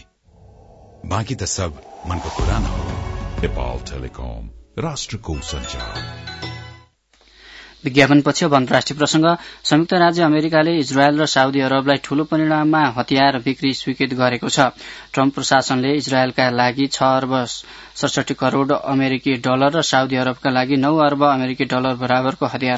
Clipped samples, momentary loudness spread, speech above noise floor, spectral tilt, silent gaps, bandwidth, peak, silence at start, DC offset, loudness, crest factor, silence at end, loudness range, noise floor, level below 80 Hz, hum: under 0.1%; 13 LU; 37 dB; -5 dB/octave; none; 8 kHz; 0 dBFS; 1.05 s; under 0.1%; -18 LUFS; 18 dB; 0 s; 11 LU; -55 dBFS; -36 dBFS; none